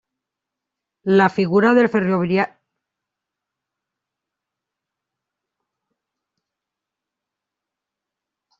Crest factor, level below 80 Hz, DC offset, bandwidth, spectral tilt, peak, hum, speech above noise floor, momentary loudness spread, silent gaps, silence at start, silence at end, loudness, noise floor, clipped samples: 20 dB; -64 dBFS; under 0.1%; 7.4 kHz; -8 dB/octave; -2 dBFS; 50 Hz at -55 dBFS; 69 dB; 8 LU; none; 1.05 s; 6.15 s; -17 LUFS; -85 dBFS; under 0.1%